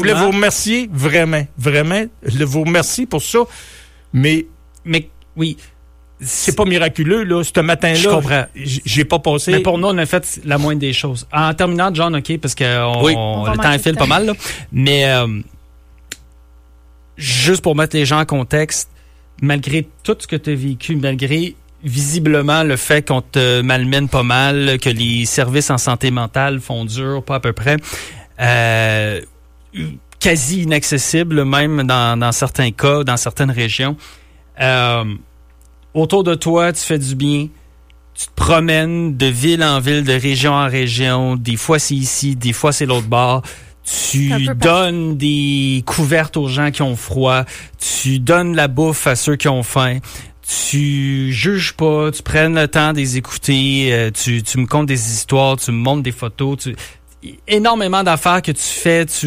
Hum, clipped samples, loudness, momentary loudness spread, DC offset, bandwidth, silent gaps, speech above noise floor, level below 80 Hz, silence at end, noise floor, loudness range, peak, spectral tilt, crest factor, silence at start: none; under 0.1%; -15 LUFS; 8 LU; under 0.1%; 15.5 kHz; none; 29 dB; -38 dBFS; 0 s; -44 dBFS; 3 LU; -2 dBFS; -4.5 dB/octave; 14 dB; 0 s